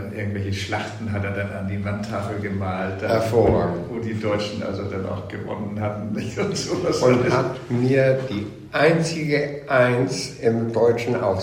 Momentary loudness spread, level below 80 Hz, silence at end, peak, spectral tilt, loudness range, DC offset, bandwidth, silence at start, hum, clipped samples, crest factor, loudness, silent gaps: 10 LU; -48 dBFS; 0 s; -4 dBFS; -6 dB/octave; 5 LU; under 0.1%; 16 kHz; 0 s; none; under 0.1%; 18 dB; -23 LUFS; none